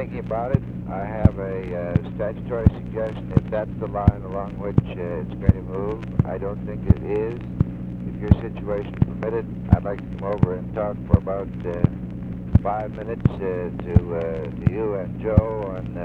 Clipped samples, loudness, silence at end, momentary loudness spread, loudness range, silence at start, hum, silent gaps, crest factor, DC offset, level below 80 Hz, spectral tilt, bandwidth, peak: under 0.1%; -24 LUFS; 0 s; 8 LU; 1 LU; 0 s; 60 Hz at -40 dBFS; none; 22 dB; under 0.1%; -32 dBFS; -11 dB/octave; 4.4 kHz; 0 dBFS